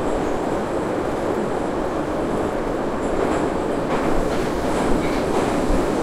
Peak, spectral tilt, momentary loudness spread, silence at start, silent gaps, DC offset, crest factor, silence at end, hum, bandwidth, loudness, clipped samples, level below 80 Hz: -6 dBFS; -6 dB/octave; 3 LU; 0 s; none; under 0.1%; 14 dB; 0 s; none; 15.5 kHz; -22 LUFS; under 0.1%; -32 dBFS